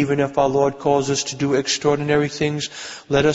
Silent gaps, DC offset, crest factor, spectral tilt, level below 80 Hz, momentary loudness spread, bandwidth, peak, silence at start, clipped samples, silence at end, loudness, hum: none; under 0.1%; 16 dB; -4.5 dB/octave; -48 dBFS; 5 LU; 8 kHz; -4 dBFS; 0 s; under 0.1%; 0 s; -20 LUFS; none